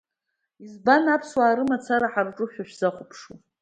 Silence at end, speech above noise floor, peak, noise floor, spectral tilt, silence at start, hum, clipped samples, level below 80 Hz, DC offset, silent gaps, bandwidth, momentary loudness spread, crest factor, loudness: 0.25 s; 57 dB; -4 dBFS; -81 dBFS; -5.5 dB/octave; 0.6 s; none; under 0.1%; -68 dBFS; under 0.1%; none; 9.4 kHz; 16 LU; 20 dB; -23 LUFS